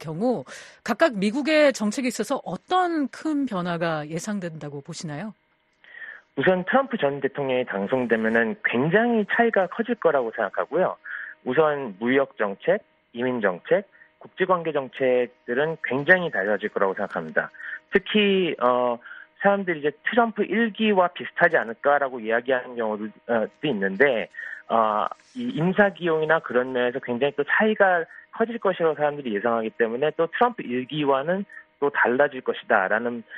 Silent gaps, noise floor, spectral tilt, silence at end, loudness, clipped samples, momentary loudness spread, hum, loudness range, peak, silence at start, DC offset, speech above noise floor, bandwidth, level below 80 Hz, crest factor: none; -57 dBFS; -5.5 dB/octave; 0 s; -23 LUFS; under 0.1%; 10 LU; none; 4 LU; -2 dBFS; 0 s; under 0.1%; 34 dB; 11.5 kHz; -68 dBFS; 22 dB